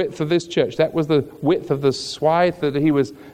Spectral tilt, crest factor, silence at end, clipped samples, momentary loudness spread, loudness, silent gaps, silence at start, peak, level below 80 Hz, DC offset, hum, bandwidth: -6 dB/octave; 16 dB; 0 s; under 0.1%; 4 LU; -20 LUFS; none; 0 s; -4 dBFS; -54 dBFS; under 0.1%; none; 15 kHz